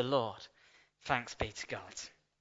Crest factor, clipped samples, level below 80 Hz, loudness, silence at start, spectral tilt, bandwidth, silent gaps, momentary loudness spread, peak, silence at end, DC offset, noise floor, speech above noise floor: 26 dB; under 0.1%; -58 dBFS; -38 LUFS; 0 s; -3 dB/octave; 7.6 kHz; none; 16 LU; -14 dBFS; 0.3 s; under 0.1%; -66 dBFS; 29 dB